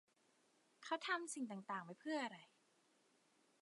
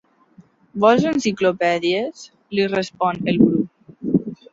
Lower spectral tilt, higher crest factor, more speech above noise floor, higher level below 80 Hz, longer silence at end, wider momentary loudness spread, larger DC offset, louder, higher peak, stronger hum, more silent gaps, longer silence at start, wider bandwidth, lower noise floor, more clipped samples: second, -3 dB/octave vs -6 dB/octave; about the same, 22 dB vs 18 dB; about the same, 32 dB vs 33 dB; second, under -90 dBFS vs -56 dBFS; first, 1.15 s vs 0.2 s; second, 9 LU vs 12 LU; neither; second, -46 LUFS vs -19 LUFS; second, -28 dBFS vs -2 dBFS; neither; neither; about the same, 0.8 s vs 0.75 s; first, 11 kHz vs 7.8 kHz; first, -78 dBFS vs -51 dBFS; neither